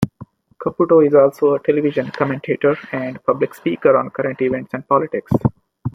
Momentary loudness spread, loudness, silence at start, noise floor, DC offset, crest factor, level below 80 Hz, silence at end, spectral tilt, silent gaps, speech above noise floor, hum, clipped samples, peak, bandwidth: 11 LU; -18 LUFS; 0 s; -41 dBFS; under 0.1%; 16 dB; -50 dBFS; 0.05 s; -8.5 dB/octave; none; 25 dB; none; under 0.1%; -2 dBFS; 15 kHz